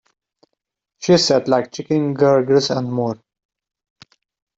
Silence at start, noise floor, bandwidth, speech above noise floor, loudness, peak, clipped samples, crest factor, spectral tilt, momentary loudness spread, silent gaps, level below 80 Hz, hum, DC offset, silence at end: 1 s; -78 dBFS; 8 kHz; 62 dB; -17 LUFS; -2 dBFS; under 0.1%; 16 dB; -5 dB/octave; 11 LU; none; -62 dBFS; none; under 0.1%; 1.45 s